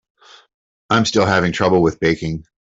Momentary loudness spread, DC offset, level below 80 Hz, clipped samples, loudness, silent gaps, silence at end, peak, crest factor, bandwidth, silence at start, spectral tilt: 6 LU; under 0.1%; -46 dBFS; under 0.1%; -17 LUFS; none; 0.25 s; -2 dBFS; 16 dB; 8 kHz; 0.9 s; -5.5 dB/octave